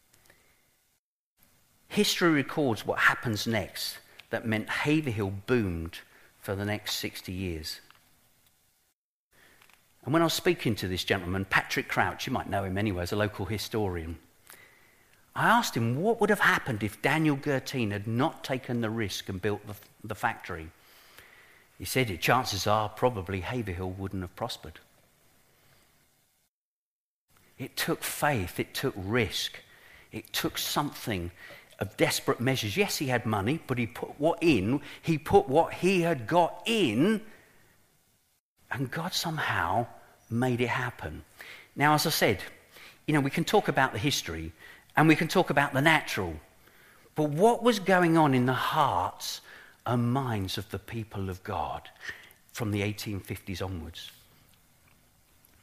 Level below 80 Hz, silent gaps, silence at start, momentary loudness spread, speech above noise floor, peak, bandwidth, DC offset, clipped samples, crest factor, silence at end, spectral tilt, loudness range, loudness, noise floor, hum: -56 dBFS; 8.94-9.31 s, 26.48-27.28 s, 38.40-38.56 s; 1.9 s; 16 LU; over 62 dB; -6 dBFS; 15.5 kHz; under 0.1%; under 0.1%; 24 dB; 1.5 s; -5 dB/octave; 10 LU; -28 LUFS; under -90 dBFS; none